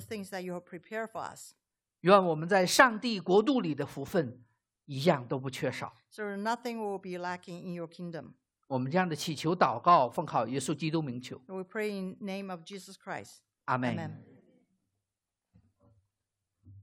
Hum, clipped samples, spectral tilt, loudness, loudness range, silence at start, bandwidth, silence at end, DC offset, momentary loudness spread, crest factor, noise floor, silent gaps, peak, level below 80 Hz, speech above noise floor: none; under 0.1%; -5 dB/octave; -31 LUFS; 12 LU; 0 s; 16 kHz; 0 s; under 0.1%; 18 LU; 26 dB; -89 dBFS; none; -6 dBFS; -74 dBFS; 58 dB